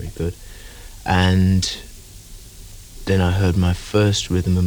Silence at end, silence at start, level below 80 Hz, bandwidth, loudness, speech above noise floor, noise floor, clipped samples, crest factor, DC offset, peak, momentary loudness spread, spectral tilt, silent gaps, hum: 0 s; 0 s; -34 dBFS; 20 kHz; -19 LUFS; 21 dB; -39 dBFS; under 0.1%; 16 dB; under 0.1%; -4 dBFS; 24 LU; -5.5 dB/octave; none; none